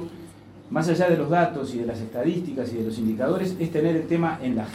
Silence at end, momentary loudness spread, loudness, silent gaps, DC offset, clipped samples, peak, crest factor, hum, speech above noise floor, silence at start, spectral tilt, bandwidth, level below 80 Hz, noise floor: 0 s; 9 LU; -25 LUFS; none; under 0.1%; under 0.1%; -8 dBFS; 16 dB; none; 20 dB; 0 s; -7.5 dB/octave; 15 kHz; -58 dBFS; -44 dBFS